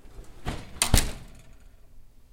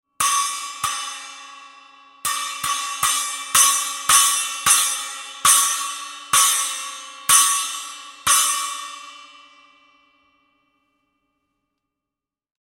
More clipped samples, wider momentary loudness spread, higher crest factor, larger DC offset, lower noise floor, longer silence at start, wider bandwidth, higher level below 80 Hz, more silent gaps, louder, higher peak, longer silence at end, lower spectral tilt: neither; about the same, 16 LU vs 17 LU; first, 28 dB vs 22 dB; neither; second, -48 dBFS vs -87 dBFS; second, 0.05 s vs 0.2 s; about the same, 17 kHz vs 17 kHz; first, -32 dBFS vs -62 dBFS; neither; second, -27 LUFS vs -18 LUFS; about the same, -2 dBFS vs 0 dBFS; second, 0.25 s vs 3.35 s; first, -3 dB/octave vs 3 dB/octave